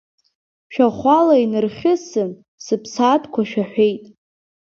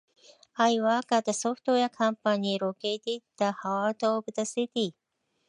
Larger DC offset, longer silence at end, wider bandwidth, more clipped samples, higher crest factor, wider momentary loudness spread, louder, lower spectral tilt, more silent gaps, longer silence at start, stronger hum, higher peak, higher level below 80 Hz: neither; about the same, 0.65 s vs 0.6 s; second, 7.6 kHz vs 11 kHz; neither; about the same, 18 dB vs 18 dB; first, 12 LU vs 7 LU; first, -18 LUFS vs -28 LUFS; first, -6 dB/octave vs -4 dB/octave; first, 2.48-2.58 s vs none; first, 0.7 s vs 0.55 s; neither; first, -2 dBFS vs -10 dBFS; first, -60 dBFS vs -82 dBFS